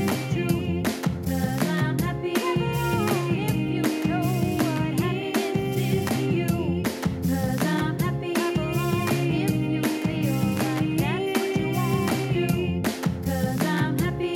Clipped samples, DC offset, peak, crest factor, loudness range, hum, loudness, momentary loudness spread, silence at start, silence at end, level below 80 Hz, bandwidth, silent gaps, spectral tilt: under 0.1%; under 0.1%; -10 dBFS; 14 dB; 1 LU; none; -25 LUFS; 2 LU; 0 s; 0 s; -46 dBFS; 18 kHz; none; -6 dB/octave